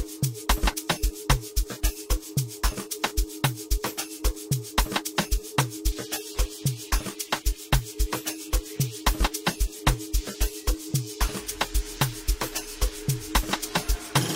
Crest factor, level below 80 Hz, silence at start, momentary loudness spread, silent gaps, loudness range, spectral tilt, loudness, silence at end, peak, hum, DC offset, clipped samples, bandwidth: 22 dB; -30 dBFS; 0 s; 5 LU; none; 1 LU; -3.5 dB/octave; -28 LUFS; 0 s; -6 dBFS; none; under 0.1%; under 0.1%; 16.5 kHz